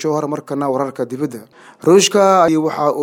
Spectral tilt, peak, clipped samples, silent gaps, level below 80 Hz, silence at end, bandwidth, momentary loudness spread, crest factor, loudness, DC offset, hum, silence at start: -4.5 dB/octave; 0 dBFS; under 0.1%; none; -64 dBFS; 0 s; 16.5 kHz; 12 LU; 14 dB; -15 LUFS; under 0.1%; none; 0 s